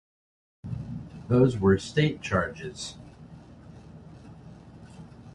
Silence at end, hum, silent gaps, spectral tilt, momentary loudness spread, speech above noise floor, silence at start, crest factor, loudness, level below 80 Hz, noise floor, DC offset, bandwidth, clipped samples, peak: 0.05 s; none; none; -6.5 dB/octave; 26 LU; 23 dB; 0.65 s; 22 dB; -27 LUFS; -50 dBFS; -48 dBFS; under 0.1%; 11 kHz; under 0.1%; -8 dBFS